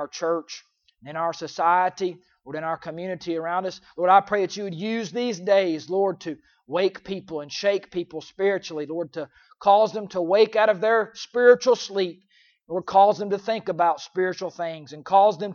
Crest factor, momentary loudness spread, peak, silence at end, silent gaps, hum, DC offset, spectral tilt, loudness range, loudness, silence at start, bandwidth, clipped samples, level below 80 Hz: 20 dB; 14 LU; -4 dBFS; 0 s; none; none; under 0.1%; -4.5 dB/octave; 6 LU; -23 LUFS; 0 s; 7.2 kHz; under 0.1%; -70 dBFS